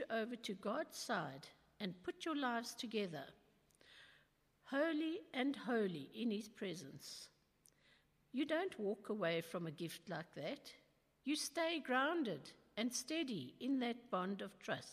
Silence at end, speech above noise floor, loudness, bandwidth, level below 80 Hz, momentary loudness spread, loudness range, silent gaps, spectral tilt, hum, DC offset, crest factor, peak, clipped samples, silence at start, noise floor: 0 s; 32 dB; -43 LUFS; 15 kHz; -84 dBFS; 13 LU; 4 LU; none; -4 dB/octave; none; under 0.1%; 20 dB; -24 dBFS; under 0.1%; 0 s; -75 dBFS